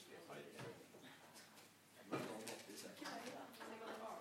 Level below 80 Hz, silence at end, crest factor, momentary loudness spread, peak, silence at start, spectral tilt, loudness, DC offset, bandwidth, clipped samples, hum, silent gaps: under -90 dBFS; 0 s; 24 dB; 12 LU; -30 dBFS; 0 s; -3.5 dB/octave; -53 LUFS; under 0.1%; 16 kHz; under 0.1%; none; none